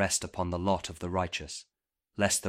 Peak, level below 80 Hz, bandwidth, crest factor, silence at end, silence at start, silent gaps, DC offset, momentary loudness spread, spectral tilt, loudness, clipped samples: -10 dBFS; -54 dBFS; 16 kHz; 22 dB; 0 s; 0 s; none; under 0.1%; 13 LU; -3.5 dB/octave; -32 LUFS; under 0.1%